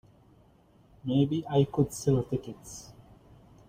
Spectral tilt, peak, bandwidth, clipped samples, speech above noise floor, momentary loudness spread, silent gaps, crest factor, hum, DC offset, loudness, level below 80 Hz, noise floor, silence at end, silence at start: -7 dB/octave; -12 dBFS; 16 kHz; under 0.1%; 33 dB; 17 LU; none; 20 dB; none; under 0.1%; -29 LUFS; -56 dBFS; -61 dBFS; 0.75 s; 1.05 s